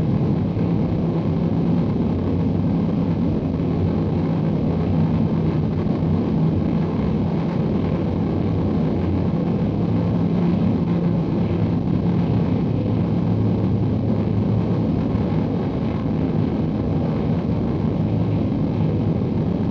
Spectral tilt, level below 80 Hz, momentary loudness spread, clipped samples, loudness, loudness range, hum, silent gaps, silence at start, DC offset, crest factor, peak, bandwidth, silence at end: -10.5 dB/octave; -38 dBFS; 2 LU; under 0.1%; -21 LUFS; 1 LU; none; none; 0 s; under 0.1%; 12 dB; -8 dBFS; 5.8 kHz; 0 s